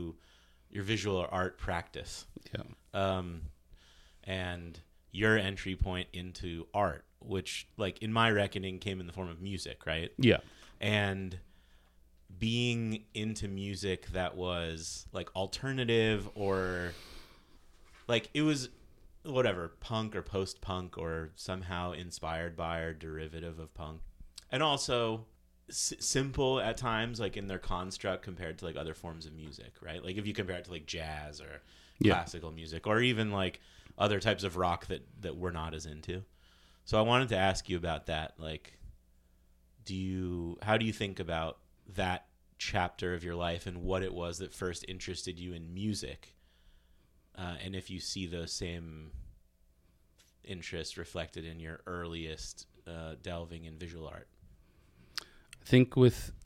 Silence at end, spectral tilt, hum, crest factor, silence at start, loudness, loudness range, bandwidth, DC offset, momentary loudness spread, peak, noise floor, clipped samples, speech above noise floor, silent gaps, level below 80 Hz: 0 s; -5 dB/octave; none; 24 dB; 0 s; -35 LUFS; 9 LU; 15.5 kHz; under 0.1%; 17 LU; -12 dBFS; -67 dBFS; under 0.1%; 32 dB; none; -52 dBFS